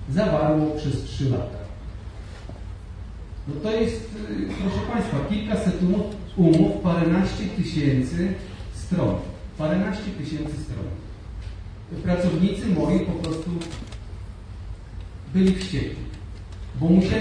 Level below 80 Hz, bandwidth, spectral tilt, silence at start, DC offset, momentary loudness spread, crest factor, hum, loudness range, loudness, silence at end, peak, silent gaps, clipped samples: -38 dBFS; 10 kHz; -7.5 dB/octave; 0 s; under 0.1%; 18 LU; 18 dB; none; 7 LU; -24 LUFS; 0 s; -6 dBFS; none; under 0.1%